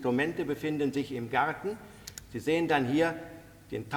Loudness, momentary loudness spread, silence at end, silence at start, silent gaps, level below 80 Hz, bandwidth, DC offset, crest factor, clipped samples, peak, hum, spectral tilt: -30 LUFS; 17 LU; 0 s; 0 s; none; -60 dBFS; over 20 kHz; under 0.1%; 18 dB; under 0.1%; -12 dBFS; none; -5.5 dB/octave